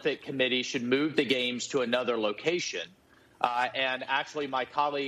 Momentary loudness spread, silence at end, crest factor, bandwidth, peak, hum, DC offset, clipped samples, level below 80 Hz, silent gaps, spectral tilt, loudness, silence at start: 5 LU; 0 s; 22 dB; 13 kHz; -8 dBFS; none; under 0.1%; under 0.1%; -74 dBFS; none; -3.5 dB/octave; -29 LUFS; 0 s